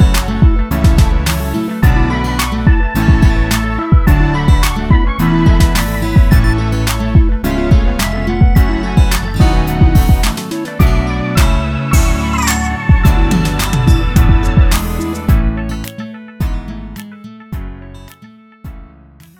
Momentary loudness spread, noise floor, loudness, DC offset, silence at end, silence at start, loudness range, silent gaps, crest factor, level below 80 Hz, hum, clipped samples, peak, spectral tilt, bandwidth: 14 LU; -40 dBFS; -13 LUFS; under 0.1%; 0.55 s; 0 s; 7 LU; none; 12 dB; -14 dBFS; none; under 0.1%; 0 dBFS; -6 dB/octave; 17.5 kHz